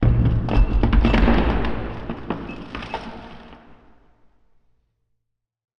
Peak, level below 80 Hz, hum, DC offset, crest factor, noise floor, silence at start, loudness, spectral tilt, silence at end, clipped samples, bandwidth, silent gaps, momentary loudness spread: -4 dBFS; -24 dBFS; none; under 0.1%; 18 dB; -77 dBFS; 0 s; -22 LUFS; -8.5 dB/octave; 2.25 s; under 0.1%; 6 kHz; none; 18 LU